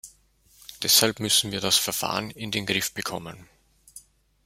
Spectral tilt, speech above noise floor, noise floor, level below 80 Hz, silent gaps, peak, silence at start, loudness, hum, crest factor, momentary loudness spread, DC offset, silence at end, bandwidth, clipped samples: -1.5 dB/octave; 34 dB; -60 dBFS; -60 dBFS; none; -2 dBFS; 0.05 s; -23 LUFS; none; 26 dB; 14 LU; under 0.1%; 0.45 s; 16 kHz; under 0.1%